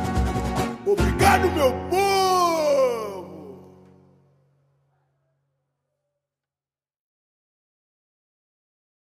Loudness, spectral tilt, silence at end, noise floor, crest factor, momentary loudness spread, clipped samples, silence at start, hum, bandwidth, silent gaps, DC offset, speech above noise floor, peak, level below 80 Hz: -21 LUFS; -5 dB/octave; 5.45 s; under -90 dBFS; 20 dB; 15 LU; under 0.1%; 0 s; none; 15.5 kHz; none; under 0.1%; over 71 dB; -6 dBFS; -38 dBFS